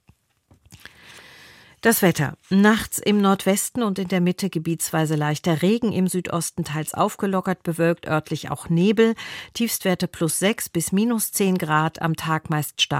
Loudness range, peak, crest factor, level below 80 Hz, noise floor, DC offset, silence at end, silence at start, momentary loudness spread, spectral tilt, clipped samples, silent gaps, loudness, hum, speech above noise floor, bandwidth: 2 LU; -4 dBFS; 18 dB; -56 dBFS; -60 dBFS; under 0.1%; 0 s; 0.7 s; 8 LU; -4.5 dB/octave; under 0.1%; none; -22 LUFS; none; 38 dB; 16.5 kHz